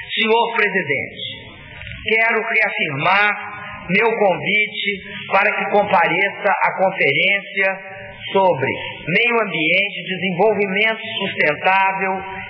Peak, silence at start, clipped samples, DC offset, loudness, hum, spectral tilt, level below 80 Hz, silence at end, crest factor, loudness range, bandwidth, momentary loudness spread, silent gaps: -4 dBFS; 0 s; under 0.1%; under 0.1%; -17 LUFS; none; -7 dB/octave; -54 dBFS; 0 s; 14 dB; 1 LU; 6 kHz; 12 LU; none